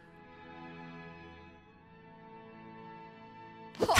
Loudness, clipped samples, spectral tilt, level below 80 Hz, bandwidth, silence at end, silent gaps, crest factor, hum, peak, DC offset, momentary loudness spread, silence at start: -48 LUFS; under 0.1%; -3 dB/octave; -68 dBFS; 15 kHz; 0 s; none; 28 dB; none; -10 dBFS; under 0.1%; 8 LU; 0 s